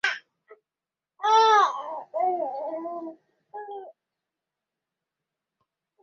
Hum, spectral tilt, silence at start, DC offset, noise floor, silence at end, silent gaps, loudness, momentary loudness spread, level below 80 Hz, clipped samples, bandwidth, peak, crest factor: none; -0.5 dB/octave; 0.05 s; under 0.1%; under -90 dBFS; 2.1 s; none; -24 LUFS; 23 LU; -84 dBFS; under 0.1%; 7.4 kHz; -8 dBFS; 22 dB